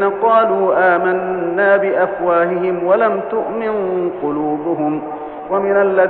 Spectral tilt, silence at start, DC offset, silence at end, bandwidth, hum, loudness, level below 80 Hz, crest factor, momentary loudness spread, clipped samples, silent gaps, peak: -5 dB/octave; 0 s; under 0.1%; 0 s; 4.3 kHz; none; -16 LUFS; -54 dBFS; 14 dB; 7 LU; under 0.1%; none; -2 dBFS